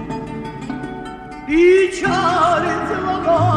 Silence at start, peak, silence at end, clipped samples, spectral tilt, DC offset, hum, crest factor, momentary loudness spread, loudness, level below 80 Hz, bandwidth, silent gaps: 0 s; -2 dBFS; 0 s; under 0.1%; -6 dB/octave; under 0.1%; none; 14 dB; 17 LU; -16 LUFS; -42 dBFS; 10.5 kHz; none